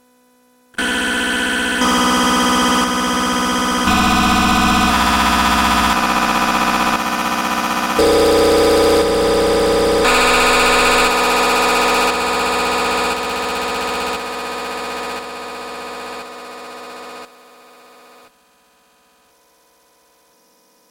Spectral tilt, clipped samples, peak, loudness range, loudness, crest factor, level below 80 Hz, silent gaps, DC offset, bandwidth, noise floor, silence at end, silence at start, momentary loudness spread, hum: -3 dB/octave; under 0.1%; -2 dBFS; 15 LU; -15 LUFS; 14 dB; -36 dBFS; none; under 0.1%; 17 kHz; -55 dBFS; 3.65 s; 0.8 s; 16 LU; none